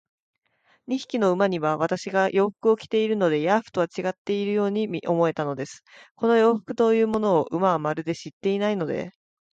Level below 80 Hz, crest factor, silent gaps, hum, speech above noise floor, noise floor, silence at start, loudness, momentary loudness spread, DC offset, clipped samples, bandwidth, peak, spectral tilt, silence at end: -68 dBFS; 16 dB; 4.18-4.25 s, 6.11-6.15 s, 8.33-8.41 s; none; 42 dB; -65 dBFS; 0.9 s; -24 LUFS; 9 LU; under 0.1%; under 0.1%; 8.6 kHz; -8 dBFS; -6.5 dB/octave; 0.45 s